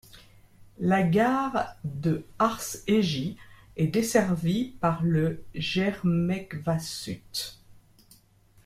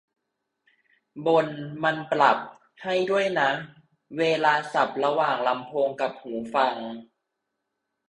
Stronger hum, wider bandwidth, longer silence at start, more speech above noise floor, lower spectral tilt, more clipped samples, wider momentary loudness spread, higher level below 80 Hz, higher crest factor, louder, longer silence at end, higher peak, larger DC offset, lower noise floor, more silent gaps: neither; first, 15.5 kHz vs 11 kHz; second, 0.15 s vs 1.15 s; second, 33 dB vs 57 dB; about the same, -6 dB/octave vs -5 dB/octave; neither; second, 10 LU vs 14 LU; first, -54 dBFS vs -72 dBFS; about the same, 18 dB vs 22 dB; about the same, -27 LUFS vs -25 LUFS; second, 0.85 s vs 1.05 s; about the same, -8 dBFS vs -6 dBFS; neither; second, -59 dBFS vs -81 dBFS; neither